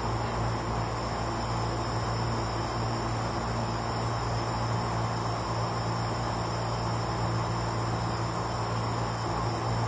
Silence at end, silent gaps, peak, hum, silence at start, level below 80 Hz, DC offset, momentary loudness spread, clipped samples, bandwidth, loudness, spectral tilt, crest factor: 0 s; none; -18 dBFS; none; 0 s; -42 dBFS; under 0.1%; 1 LU; under 0.1%; 8 kHz; -31 LUFS; -5.5 dB/octave; 12 dB